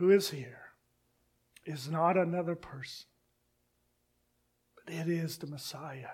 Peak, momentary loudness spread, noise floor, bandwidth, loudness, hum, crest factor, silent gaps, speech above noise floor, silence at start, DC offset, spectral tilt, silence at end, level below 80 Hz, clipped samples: -14 dBFS; 20 LU; -76 dBFS; 16.5 kHz; -34 LUFS; 60 Hz at -75 dBFS; 22 dB; none; 44 dB; 0 s; under 0.1%; -5.5 dB/octave; 0 s; -74 dBFS; under 0.1%